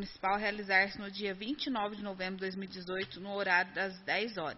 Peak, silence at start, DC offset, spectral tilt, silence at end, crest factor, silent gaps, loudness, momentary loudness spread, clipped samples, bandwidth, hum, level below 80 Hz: -14 dBFS; 0 s; under 0.1%; -1.5 dB/octave; 0 s; 22 dB; none; -34 LUFS; 10 LU; under 0.1%; 6 kHz; none; -64 dBFS